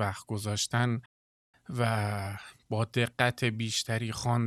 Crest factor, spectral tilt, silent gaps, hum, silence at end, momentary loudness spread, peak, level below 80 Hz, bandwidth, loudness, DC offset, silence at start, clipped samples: 22 dB; -4.5 dB/octave; 1.06-1.53 s; none; 0 s; 9 LU; -8 dBFS; -64 dBFS; 13.5 kHz; -31 LUFS; under 0.1%; 0 s; under 0.1%